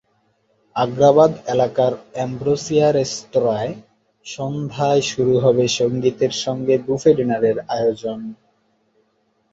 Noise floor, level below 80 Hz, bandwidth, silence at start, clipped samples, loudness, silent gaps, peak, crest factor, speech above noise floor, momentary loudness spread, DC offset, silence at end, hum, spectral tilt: -65 dBFS; -56 dBFS; 8 kHz; 0.75 s; under 0.1%; -18 LUFS; none; -2 dBFS; 18 dB; 47 dB; 12 LU; under 0.1%; 1.2 s; none; -5.5 dB/octave